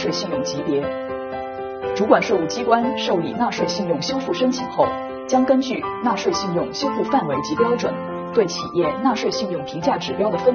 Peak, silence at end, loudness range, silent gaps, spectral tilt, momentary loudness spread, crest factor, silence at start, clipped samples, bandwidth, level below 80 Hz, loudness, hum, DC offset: 0 dBFS; 0 s; 1 LU; none; -4 dB/octave; 9 LU; 20 dB; 0 s; under 0.1%; 6.8 kHz; -54 dBFS; -21 LUFS; none; under 0.1%